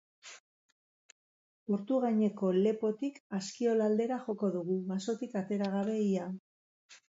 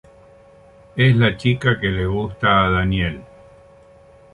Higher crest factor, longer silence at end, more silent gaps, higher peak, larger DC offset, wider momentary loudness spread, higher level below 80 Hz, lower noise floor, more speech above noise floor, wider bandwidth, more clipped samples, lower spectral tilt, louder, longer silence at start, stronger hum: about the same, 16 dB vs 18 dB; second, 0.15 s vs 1.1 s; first, 0.40-1.66 s, 3.20-3.30 s, 6.39-6.89 s vs none; second, -18 dBFS vs -2 dBFS; neither; first, 12 LU vs 9 LU; second, -82 dBFS vs -36 dBFS; first, under -90 dBFS vs -48 dBFS; first, over 58 dB vs 30 dB; second, 7.8 kHz vs 9.8 kHz; neither; about the same, -7 dB/octave vs -7.5 dB/octave; second, -33 LUFS vs -18 LUFS; second, 0.25 s vs 0.95 s; neither